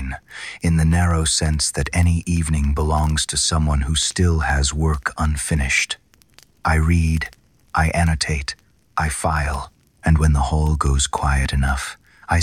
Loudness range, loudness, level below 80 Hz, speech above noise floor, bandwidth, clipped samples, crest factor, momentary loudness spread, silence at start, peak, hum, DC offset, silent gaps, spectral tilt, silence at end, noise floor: 3 LU; -20 LUFS; -26 dBFS; 34 dB; 13.5 kHz; under 0.1%; 14 dB; 10 LU; 0 s; -6 dBFS; none; under 0.1%; none; -4.5 dB/octave; 0 s; -52 dBFS